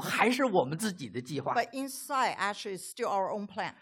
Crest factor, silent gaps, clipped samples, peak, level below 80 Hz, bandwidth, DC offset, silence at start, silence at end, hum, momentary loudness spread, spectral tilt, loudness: 22 dB; none; under 0.1%; -10 dBFS; -78 dBFS; 17 kHz; under 0.1%; 0 s; 0.1 s; none; 11 LU; -4 dB/octave; -31 LUFS